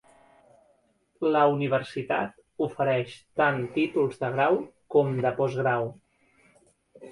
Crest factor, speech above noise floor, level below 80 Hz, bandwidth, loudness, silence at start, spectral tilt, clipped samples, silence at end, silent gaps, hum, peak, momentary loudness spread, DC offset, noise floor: 18 dB; 42 dB; -68 dBFS; 11.5 kHz; -26 LUFS; 1.2 s; -7.5 dB/octave; under 0.1%; 0 s; none; none; -10 dBFS; 8 LU; under 0.1%; -68 dBFS